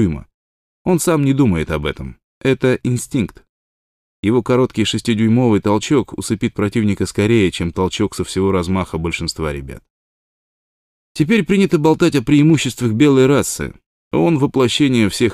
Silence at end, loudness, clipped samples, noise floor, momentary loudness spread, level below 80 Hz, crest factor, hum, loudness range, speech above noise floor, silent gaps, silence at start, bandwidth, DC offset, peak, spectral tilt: 0 s; -16 LUFS; under 0.1%; under -90 dBFS; 10 LU; -40 dBFS; 14 dB; none; 6 LU; over 75 dB; 0.34-0.85 s, 2.24-2.41 s, 3.49-4.23 s, 9.90-11.15 s, 13.86-14.11 s; 0 s; 15 kHz; under 0.1%; -2 dBFS; -6 dB/octave